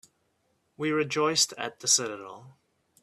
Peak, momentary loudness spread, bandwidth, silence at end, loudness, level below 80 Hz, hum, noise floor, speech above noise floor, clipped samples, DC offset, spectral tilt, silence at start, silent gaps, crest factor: -10 dBFS; 14 LU; 14.5 kHz; 0.5 s; -26 LUFS; -76 dBFS; none; -73 dBFS; 45 dB; under 0.1%; under 0.1%; -1.5 dB/octave; 0.8 s; none; 20 dB